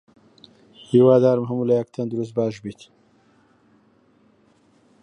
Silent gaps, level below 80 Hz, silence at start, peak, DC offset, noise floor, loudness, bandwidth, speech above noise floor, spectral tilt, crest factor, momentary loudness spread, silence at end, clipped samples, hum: none; -66 dBFS; 0.9 s; -4 dBFS; under 0.1%; -59 dBFS; -20 LUFS; 8.8 kHz; 39 dB; -9 dB/octave; 18 dB; 13 LU; 2.3 s; under 0.1%; none